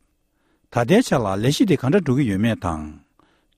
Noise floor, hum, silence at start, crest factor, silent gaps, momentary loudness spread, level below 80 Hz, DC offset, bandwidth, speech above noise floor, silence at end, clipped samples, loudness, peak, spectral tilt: -66 dBFS; none; 0.7 s; 16 dB; none; 10 LU; -46 dBFS; under 0.1%; 15.5 kHz; 47 dB; 0.6 s; under 0.1%; -20 LUFS; -4 dBFS; -6.5 dB/octave